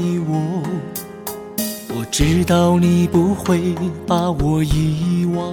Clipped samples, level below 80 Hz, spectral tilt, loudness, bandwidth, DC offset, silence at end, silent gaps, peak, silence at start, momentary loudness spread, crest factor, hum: under 0.1%; -32 dBFS; -6 dB/octave; -18 LUFS; 17.5 kHz; under 0.1%; 0 s; none; -4 dBFS; 0 s; 11 LU; 14 dB; none